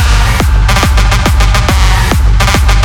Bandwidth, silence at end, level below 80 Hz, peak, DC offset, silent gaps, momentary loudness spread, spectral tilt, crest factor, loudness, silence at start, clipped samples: 17 kHz; 0 s; -8 dBFS; 0 dBFS; under 0.1%; none; 1 LU; -4.5 dB/octave; 6 dB; -9 LUFS; 0 s; under 0.1%